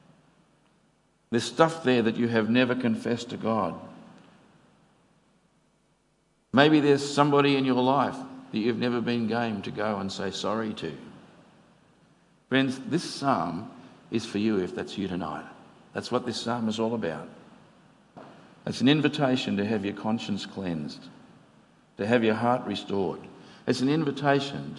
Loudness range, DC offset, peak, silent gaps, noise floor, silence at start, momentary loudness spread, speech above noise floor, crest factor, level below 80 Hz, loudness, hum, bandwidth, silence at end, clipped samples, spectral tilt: 8 LU; under 0.1%; -2 dBFS; none; -68 dBFS; 1.3 s; 14 LU; 42 dB; 26 dB; -72 dBFS; -27 LUFS; none; 11.5 kHz; 0 s; under 0.1%; -5.5 dB/octave